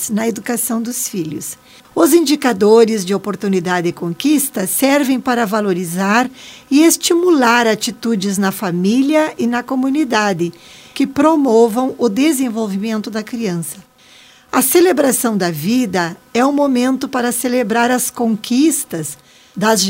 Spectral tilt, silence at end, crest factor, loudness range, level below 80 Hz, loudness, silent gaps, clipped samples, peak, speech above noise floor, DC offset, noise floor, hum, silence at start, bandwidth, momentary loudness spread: -4 dB/octave; 0 s; 14 dB; 3 LU; -60 dBFS; -15 LUFS; none; under 0.1%; 0 dBFS; 30 dB; under 0.1%; -45 dBFS; none; 0 s; 16.5 kHz; 10 LU